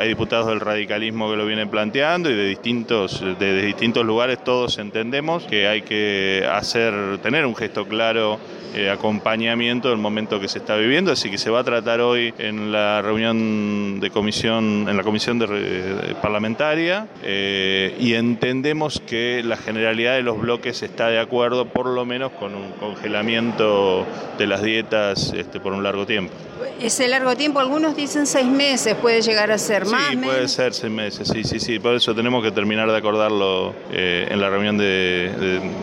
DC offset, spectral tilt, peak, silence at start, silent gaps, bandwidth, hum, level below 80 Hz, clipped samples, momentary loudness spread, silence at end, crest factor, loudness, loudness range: under 0.1%; -4 dB/octave; -2 dBFS; 0 s; none; 15.5 kHz; none; -56 dBFS; under 0.1%; 6 LU; 0 s; 18 dB; -20 LUFS; 3 LU